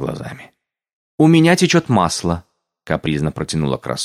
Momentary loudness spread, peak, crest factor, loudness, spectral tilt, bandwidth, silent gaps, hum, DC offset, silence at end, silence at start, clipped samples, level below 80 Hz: 15 LU; 0 dBFS; 16 dB; -16 LUFS; -5.5 dB/octave; 14 kHz; 0.93-1.18 s; none; under 0.1%; 0 s; 0 s; under 0.1%; -42 dBFS